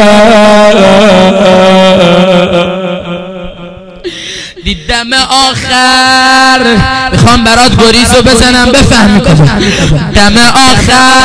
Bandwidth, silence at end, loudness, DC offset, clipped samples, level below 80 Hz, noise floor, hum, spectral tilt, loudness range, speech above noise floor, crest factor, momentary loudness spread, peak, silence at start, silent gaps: 11 kHz; 0 s; -4 LUFS; under 0.1%; 20%; -20 dBFS; -25 dBFS; none; -4 dB/octave; 7 LU; 21 dB; 6 dB; 14 LU; 0 dBFS; 0 s; none